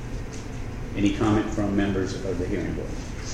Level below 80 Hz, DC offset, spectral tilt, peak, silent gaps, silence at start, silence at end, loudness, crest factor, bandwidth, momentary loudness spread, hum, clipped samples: -36 dBFS; under 0.1%; -6.5 dB/octave; -8 dBFS; none; 0 s; 0 s; -27 LUFS; 18 dB; 12 kHz; 12 LU; none; under 0.1%